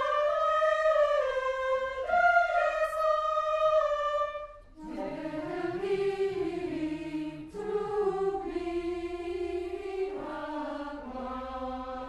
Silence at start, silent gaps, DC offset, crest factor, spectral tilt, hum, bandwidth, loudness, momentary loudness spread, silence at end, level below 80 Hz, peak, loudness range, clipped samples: 0 s; none; under 0.1%; 18 dB; -5.5 dB/octave; none; 12 kHz; -30 LUFS; 12 LU; 0 s; -54 dBFS; -12 dBFS; 8 LU; under 0.1%